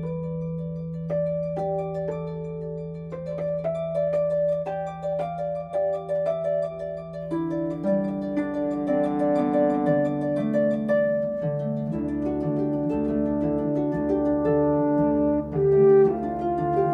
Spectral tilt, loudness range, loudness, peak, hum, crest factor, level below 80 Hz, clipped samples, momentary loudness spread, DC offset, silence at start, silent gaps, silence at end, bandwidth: -10 dB/octave; 7 LU; -25 LUFS; -8 dBFS; none; 16 dB; -50 dBFS; under 0.1%; 9 LU; under 0.1%; 0 s; none; 0 s; 7.6 kHz